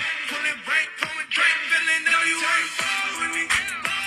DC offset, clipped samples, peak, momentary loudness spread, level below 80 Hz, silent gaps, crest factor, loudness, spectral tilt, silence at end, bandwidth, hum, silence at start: under 0.1%; under 0.1%; -4 dBFS; 6 LU; -62 dBFS; none; 20 dB; -21 LUFS; 0.5 dB/octave; 0 s; 15.5 kHz; none; 0 s